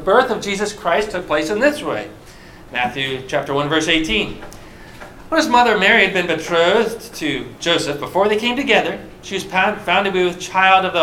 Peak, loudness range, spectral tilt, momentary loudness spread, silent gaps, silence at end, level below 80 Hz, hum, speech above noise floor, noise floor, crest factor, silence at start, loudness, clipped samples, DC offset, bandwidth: 0 dBFS; 5 LU; -3.5 dB/octave; 13 LU; none; 0 s; -44 dBFS; none; 22 dB; -40 dBFS; 18 dB; 0 s; -17 LUFS; under 0.1%; under 0.1%; 16.5 kHz